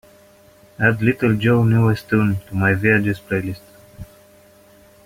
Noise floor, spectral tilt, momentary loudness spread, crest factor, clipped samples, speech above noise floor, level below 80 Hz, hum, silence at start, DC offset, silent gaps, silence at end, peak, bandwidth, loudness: -49 dBFS; -8 dB/octave; 9 LU; 18 dB; under 0.1%; 32 dB; -50 dBFS; none; 0.8 s; under 0.1%; none; 1 s; -2 dBFS; 16 kHz; -18 LUFS